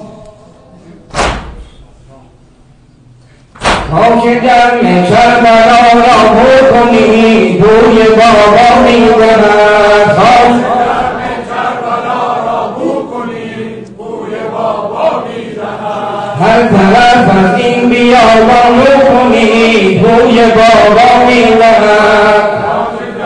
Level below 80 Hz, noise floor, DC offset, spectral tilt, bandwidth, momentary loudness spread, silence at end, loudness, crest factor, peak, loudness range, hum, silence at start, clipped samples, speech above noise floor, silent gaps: -32 dBFS; -41 dBFS; under 0.1%; -5.5 dB/octave; 10.5 kHz; 13 LU; 0 s; -6 LUFS; 6 dB; 0 dBFS; 11 LU; none; 0 s; 0.1%; 36 dB; none